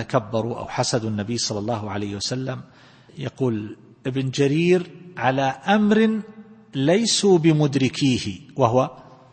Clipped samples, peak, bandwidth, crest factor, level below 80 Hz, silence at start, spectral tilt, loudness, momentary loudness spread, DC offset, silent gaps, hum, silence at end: under 0.1%; -2 dBFS; 8.8 kHz; 20 dB; -58 dBFS; 0 s; -5 dB/octave; -22 LUFS; 14 LU; under 0.1%; none; none; 0.3 s